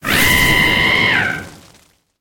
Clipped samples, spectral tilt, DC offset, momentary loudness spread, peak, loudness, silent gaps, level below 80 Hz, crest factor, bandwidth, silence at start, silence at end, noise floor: under 0.1%; -2.5 dB/octave; under 0.1%; 9 LU; -2 dBFS; -12 LUFS; none; -32 dBFS; 14 dB; 17 kHz; 0.05 s; 0.65 s; -52 dBFS